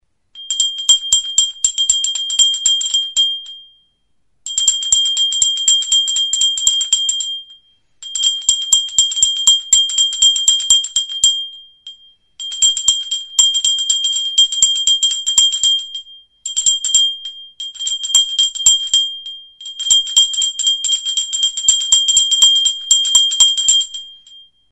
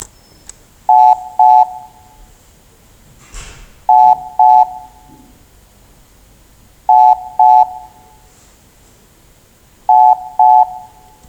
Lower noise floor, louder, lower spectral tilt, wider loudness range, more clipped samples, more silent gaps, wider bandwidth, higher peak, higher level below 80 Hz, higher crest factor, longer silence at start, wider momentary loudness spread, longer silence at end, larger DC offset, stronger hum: first, -65 dBFS vs -47 dBFS; about the same, -12 LUFS vs -10 LUFS; second, 5 dB/octave vs -3.5 dB/octave; first, 3 LU vs 0 LU; neither; neither; first, 12 kHz vs 10.5 kHz; about the same, 0 dBFS vs 0 dBFS; second, -54 dBFS vs -46 dBFS; about the same, 16 dB vs 14 dB; first, 0.35 s vs 0 s; second, 13 LU vs 25 LU; second, 0.3 s vs 0.5 s; neither; neither